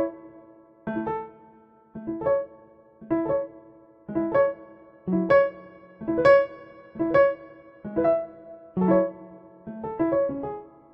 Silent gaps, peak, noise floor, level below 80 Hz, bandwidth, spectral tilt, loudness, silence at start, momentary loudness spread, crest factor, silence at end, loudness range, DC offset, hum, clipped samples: none; -6 dBFS; -54 dBFS; -58 dBFS; 5.6 kHz; -9 dB/octave; -25 LUFS; 0 s; 23 LU; 20 dB; 0.25 s; 7 LU; under 0.1%; none; under 0.1%